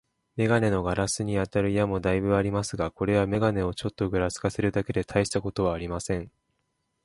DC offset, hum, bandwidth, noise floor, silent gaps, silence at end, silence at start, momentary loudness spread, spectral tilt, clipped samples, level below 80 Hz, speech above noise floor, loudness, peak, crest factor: under 0.1%; none; 11.5 kHz; -76 dBFS; none; 0.75 s; 0.35 s; 7 LU; -6 dB/octave; under 0.1%; -46 dBFS; 50 dB; -27 LUFS; -8 dBFS; 18 dB